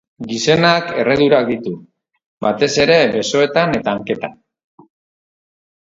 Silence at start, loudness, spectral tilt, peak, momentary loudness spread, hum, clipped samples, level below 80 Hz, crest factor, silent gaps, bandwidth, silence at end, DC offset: 0.2 s; -15 LUFS; -4.5 dB/octave; 0 dBFS; 12 LU; none; under 0.1%; -52 dBFS; 18 dB; 2.26-2.41 s; 7.8 kHz; 1.6 s; under 0.1%